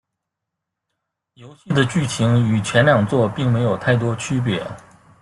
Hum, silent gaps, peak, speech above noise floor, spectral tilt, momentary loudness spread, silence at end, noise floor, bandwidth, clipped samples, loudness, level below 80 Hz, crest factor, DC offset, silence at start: none; none; -2 dBFS; 63 dB; -6 dB/octave; 7 LU; 0.4 s; -81 dBFS; 11.5 kHz; under 0.1%; -18 LUFS; -52 dBFS; 18 dB; under 0.1%; 1.4 s